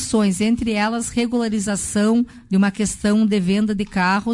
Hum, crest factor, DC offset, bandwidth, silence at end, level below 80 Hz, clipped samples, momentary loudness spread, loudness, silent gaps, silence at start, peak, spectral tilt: none; 10 dB; under 0.1%; 11.5 kHz; 0 s; -44 dBFS; under 0.1%; 3 LU; -19 LUFS; none; 0 s; -8 dBFS; -5 dB/octave